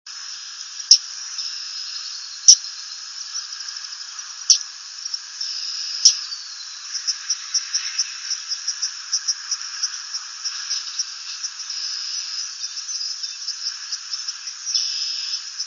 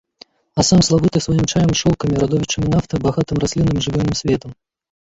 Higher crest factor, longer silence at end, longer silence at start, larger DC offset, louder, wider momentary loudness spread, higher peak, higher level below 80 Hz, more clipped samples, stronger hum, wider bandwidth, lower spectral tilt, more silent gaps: first, 24 dB vs 16 dB; second, 0 s vs 0.5 s; second, 0.05 s vs 0.55 s; neither; second, -21 LUFS vs -17 LUFS; first, 16 LU vs 6 LU; about the same, 0 dBFS vs -2 dBFS; second, under -90 dBFS vs -36 dBFS; neither; neither; first, 11 kHz vs 8 kHz; second, 9 dB/octave vs -5.5 dB/octave; neither